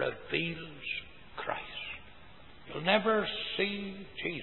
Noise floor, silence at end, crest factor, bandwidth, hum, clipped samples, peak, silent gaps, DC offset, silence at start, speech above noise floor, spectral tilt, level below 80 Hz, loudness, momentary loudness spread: -55 dBFS; 0 s; 24 dB; 4.3 kHz; none; under 0.1%; -10 dBFS; none; 0.2%; 0 s; 23 dB; -8.5 dB/octave; -62 dBFS; -33 LUFS; 15 LU